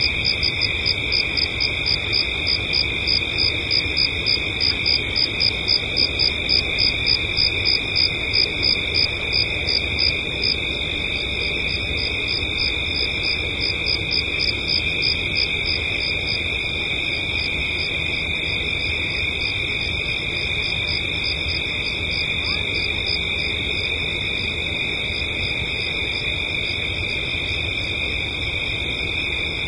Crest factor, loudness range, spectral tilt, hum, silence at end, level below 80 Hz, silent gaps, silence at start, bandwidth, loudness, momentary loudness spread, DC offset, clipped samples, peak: 16 dB; 4 LU; -3.5 dB/octave; none; 0 s; -36 dBFS; none; 0 s; 11.5 kHz; -19 LUFS; 5 LU; under 0.1%; under 0.1%; -6 dBFS